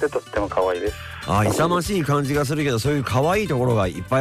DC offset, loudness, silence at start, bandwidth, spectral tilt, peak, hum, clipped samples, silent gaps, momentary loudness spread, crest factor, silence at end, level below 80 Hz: under 0.1%; -21 LUFS; 0 s; 15.5 kHz; -6 dB/octave; -10 dBFS; none; under 0.1%; none; 5 LU; 12 dB; 0 s; -40 dBFS